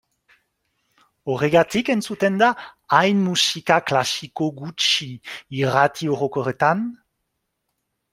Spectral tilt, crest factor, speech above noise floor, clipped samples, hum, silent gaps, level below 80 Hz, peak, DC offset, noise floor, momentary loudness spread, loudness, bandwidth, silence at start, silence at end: -4 dB/octave; 22 dB; 56 dB; under 0.1%; none; none; -62 dBFS; 0 dBFS; under 0.1%; -76 dBFS; 11 LU; -20 LUFS; 16 kHz; 1.25 s; 1.15 s